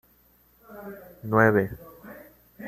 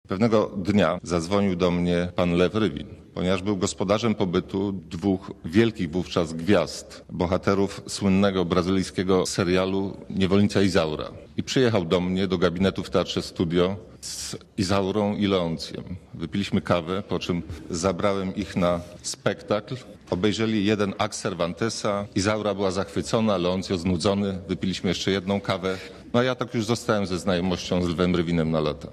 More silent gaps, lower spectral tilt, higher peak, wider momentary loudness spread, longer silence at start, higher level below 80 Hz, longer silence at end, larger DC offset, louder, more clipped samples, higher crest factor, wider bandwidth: neither; first, -9 dB/octave vs -5.5 dB/octave; about the same, -6 dBFS vs -6 dBFS; first, 25 LU vs 8 LU; first, 0.7 s vs 0.1 s; second, -58 dBFS vs -44 dBFS; about the same, 0 s vs 0 s; neither; about the same, -23 LUFS vs -25 LUFS; neither; about the same, 22 dB vs 18 dB; first, 15 kHz vs 13 kHz